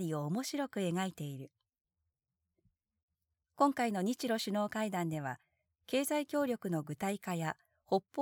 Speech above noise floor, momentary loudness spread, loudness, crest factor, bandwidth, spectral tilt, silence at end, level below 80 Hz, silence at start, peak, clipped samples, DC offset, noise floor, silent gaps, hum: 53 dB; 11 LU; -36 LUFS; 20 dB; 20 kHz; -5.5 dB/octave; 0 s; -80 dBFS; 0 s; -16 dBFS; under 0.1%; under 0.1%; -89 dBFS; 1.81-1.85 s, 3.03-3.08 s; none